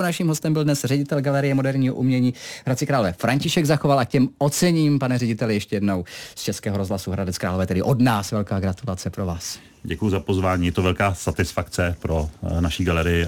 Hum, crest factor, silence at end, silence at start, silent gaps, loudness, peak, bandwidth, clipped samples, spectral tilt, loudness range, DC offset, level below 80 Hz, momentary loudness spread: none; 14 dB; 0 s; 0 s; none; -22 LUFS; -6 dBFS; 19 kHz; under 0.1%; -6 dB/octave; 3 LU; under 0.1%; -40 dBFS; 8 LU